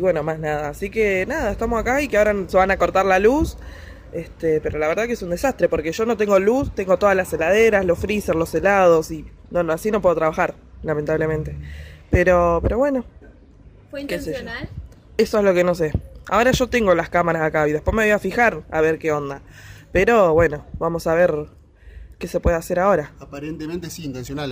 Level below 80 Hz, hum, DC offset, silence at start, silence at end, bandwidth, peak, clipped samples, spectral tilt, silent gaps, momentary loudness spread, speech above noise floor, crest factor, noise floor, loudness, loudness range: -36 dBFS; none; under 0.1%; 0 s; 0 s; 16 kHz; -4 dBFS; under 0.1%; -6 dB/octave; none; 16 LU; 27 dB; 16 dB; -46 dBFS; -19 LUFS; 4 LU